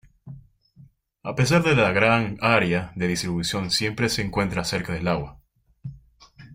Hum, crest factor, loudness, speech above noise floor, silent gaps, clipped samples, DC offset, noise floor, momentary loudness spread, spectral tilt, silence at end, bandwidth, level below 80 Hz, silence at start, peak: none; 22 dB; -22 LUFS; 31 dB; none; under 0.1%; under 0.1%; -53 dBFS; 19 LU; -5 dB/octave; 0 s; 16 kHz; -48 dBFS; 0.25 s; -4 dBFS